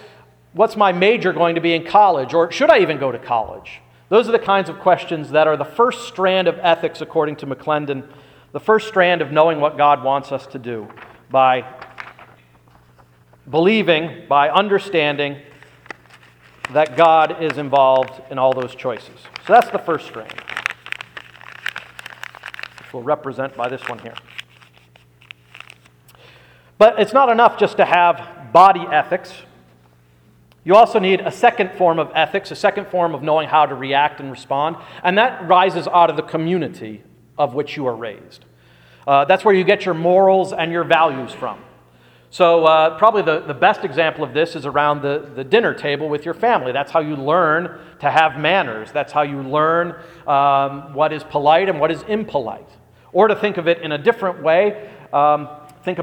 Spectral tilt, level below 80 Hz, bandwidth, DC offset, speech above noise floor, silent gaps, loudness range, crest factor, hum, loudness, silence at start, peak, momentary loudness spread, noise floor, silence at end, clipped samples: -6 dB/octave; -60 dBFS; 15 kHz; under 0.1%; 35 dB; none; 7 LU; 18 dB; 60 Hz at -55 dBFS; -17 LUFS; 0.05 s; 0 dBFS; 18 LU; -52 dBFS; 0 s; under 0.1%